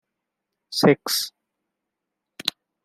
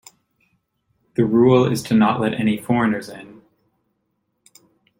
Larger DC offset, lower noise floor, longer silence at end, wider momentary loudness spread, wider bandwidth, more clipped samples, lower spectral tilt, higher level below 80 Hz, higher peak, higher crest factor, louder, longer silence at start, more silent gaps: neither; first, -83 dBFS vs -72 dBFS; second, 0.35 s vs 1.7 s; about the same, 11 LU vs 13 LU; about the same, 16 kHz vs 16.5 kHz; neither; second, -4 dB/octave vs -7 dB/octave; second, -72 dBFS vs -56 dBFS; about the same, -2 dBFS vs -2 dBFS; first, 26 dB vs 18 dB; second, -23 LUFS vs -18 LUFS; second, 0.7 s vs 1.2 s; neither